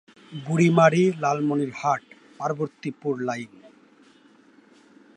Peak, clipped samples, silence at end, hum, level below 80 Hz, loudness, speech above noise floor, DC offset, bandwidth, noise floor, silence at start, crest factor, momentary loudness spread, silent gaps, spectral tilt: -4 dBFS; under 0.1%; 1.7 s; none; -72 dBFS; -23 LUFS; 33 dB; under 0.1%; 9.2 kHz; -55 dBFS; 0.3 s; 20 dB; 16 LU; none; -6.5 dB/octave